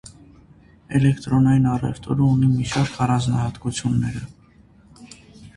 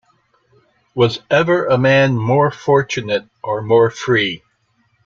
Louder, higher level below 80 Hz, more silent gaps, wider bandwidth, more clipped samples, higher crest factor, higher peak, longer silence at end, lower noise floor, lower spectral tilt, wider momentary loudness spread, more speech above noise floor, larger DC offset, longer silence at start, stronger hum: second, -20 LUFS vs -16 LUFS; first, -44 dBFS vs -54 dBFS; neither; first, 11 kHz vs 7.4 kHz; neither; about the same, 16 dB vs 14 dB; second, -6 dBFS vs -2 dBFS; second, 0.05 s vs 0.7 s; second, -51 dBFS vs -62 dBFS; about the same, -6.5 dB/octave vs -6 dB/octave; about the same, 8 LU vs 9 LU; second, 32 dB vs 47 dB; neither; about the same, 0.9 s vs 0.95 s; neither